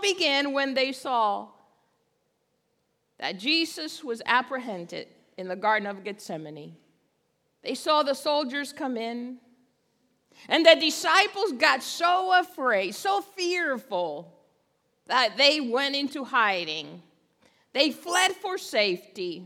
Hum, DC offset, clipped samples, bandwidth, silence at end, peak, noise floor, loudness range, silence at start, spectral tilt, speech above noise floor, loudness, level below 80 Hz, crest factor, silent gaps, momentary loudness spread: none; under 0.1%; under 0.1%; 18 kHz; 0 s; -2 dBFS; -74 dBFS; 8 LU; 0 s; -2 dB/octave; 48 dB; -25 LUFS; -84 dBFS; 26 dB; none; 16 LU